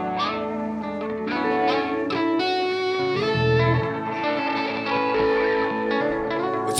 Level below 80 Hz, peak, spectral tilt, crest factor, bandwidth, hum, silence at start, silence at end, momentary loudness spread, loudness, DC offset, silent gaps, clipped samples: -50 dBFS; -8 dBFS; -5.5 dB/octave; 14 dB; 11 kHz; none; 0 s; 0 s; 7 LU; -23 LUFS; under 0.1%; none; under 0.1%